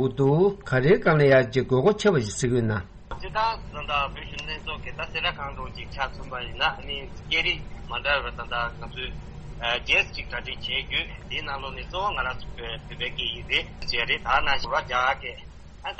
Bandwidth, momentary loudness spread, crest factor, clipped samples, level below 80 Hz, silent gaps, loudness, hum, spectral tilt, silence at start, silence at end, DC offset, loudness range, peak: 8.4 kHz; 14 LU; 18 dB; under 0.1%; -42 dBFS; none; -25 LUFS; none; -5 dB/octave; 0 s; 0 s; under 0.1%; 7 LU; -8 dBFS